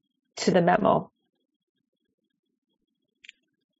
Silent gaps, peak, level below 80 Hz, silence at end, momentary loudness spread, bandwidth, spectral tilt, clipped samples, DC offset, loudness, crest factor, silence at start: none; -4 dBFS; -66 dBFS; 2.75 s; 9 LU; 7.6 kHz; -5 dB/octave; under 0.1%; under 0.1%; -23 LUFS; 24 dB; 0.35 s